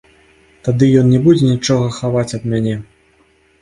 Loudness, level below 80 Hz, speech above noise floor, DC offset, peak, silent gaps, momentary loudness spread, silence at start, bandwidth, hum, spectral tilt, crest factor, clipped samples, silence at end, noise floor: -14 LUFS; -46 dBFS; 41 dB; under 0.1%; 0 dBFS; none; 10 LU; 0.65 s; 11 kHz; none; -7 dB/octave; 14 dB; under 0.1%; 0.8 s; -54 dBFS